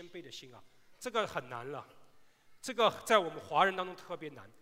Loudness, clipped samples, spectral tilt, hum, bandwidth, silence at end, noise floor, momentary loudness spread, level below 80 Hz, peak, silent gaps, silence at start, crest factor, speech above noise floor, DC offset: -33 LUFS; under 0.1%; -3.5 dB/octave; none; 16 kHz; 0.15 s; -59 dBFS; 18 LU; -74 dBFS; -10 dBFS; none; 0 s; 24 dB; 25 dB; under 0.1%